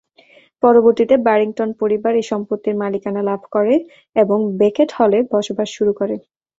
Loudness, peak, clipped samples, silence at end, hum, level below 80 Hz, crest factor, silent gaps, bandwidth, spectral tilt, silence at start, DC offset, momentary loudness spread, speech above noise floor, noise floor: -17 LUFS; -2 dBFS; under 0.1%; 0.4 s; none; -60 dBFS; 16 dB; none; 7.8 kHz; -6.5 dB/octave; 0.65 s; under 0.1%; 8 LU; 34 dB; -50 dBFS